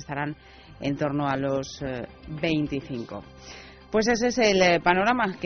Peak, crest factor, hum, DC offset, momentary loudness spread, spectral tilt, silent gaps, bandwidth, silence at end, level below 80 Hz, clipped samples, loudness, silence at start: -6 dBFS; 20 dB; none; under 0.1%; 21 LU; -3.5 dB/octave; none; 6.6 kHz; 0 s; -52 dBFS; under 0.1%; -25 LUFS; 0 s